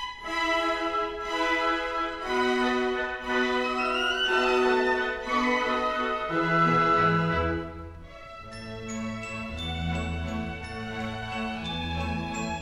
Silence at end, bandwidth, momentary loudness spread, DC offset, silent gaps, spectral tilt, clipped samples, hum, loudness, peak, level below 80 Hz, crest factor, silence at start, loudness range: 0 s; 14.5 kHz; 12 LU; under 0.1%; none; -5 dB/octave; under 0.1%; none; -27 LUFS; -12 dBFS; -46 dBFS; 16 dB; 0 s; 9 LU